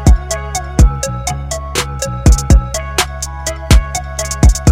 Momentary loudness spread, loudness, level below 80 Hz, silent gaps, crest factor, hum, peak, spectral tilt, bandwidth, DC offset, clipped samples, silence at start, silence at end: 9 LU; -15 LUFS; -14 dBFS; none; 12 dB; none; 0 dBFS; -4.5 dB/octave; 16 kHz; under 0.1%; under 0.1%; 0 s; 0 s